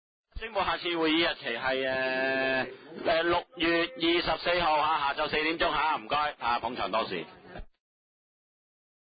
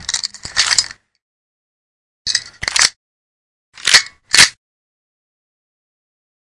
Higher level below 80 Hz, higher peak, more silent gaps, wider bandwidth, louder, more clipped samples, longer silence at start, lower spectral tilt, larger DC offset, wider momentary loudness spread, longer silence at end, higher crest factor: about the same, -54 dBFS vs -52 dBFS; second, -12 dBFS vs 0 dBFS; second, none vs 1.22-2.25 s, 2.96-3.72 s; second, 5 kHz vs 12 kHz; second, -28 LUFS vs -13 LUFS; second, under 0.1% vs 0.2%; first, 0.35 s vs 0 s; first, -8 dB/octave vs 2 dB/octave; neither; about the same, 9 LU vs 11 LU; second, 1.45 s vs 2.05 s; about the same, 16 dB vs 20 dB